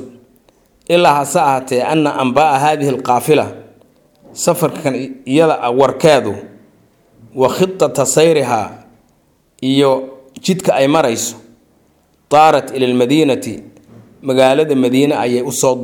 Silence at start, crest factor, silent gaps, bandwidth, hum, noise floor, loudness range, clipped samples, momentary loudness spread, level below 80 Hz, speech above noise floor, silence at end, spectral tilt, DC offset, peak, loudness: 0 s; 14 dB; none; 19.5 kHz; none; -56 dBFS; 3 LU; under 0.1%; 12 LU; -56 dBFS; 43 dB; 0 s; -4.5 dB/octave; under 0.1%; 0 dBFS; -13 LUFS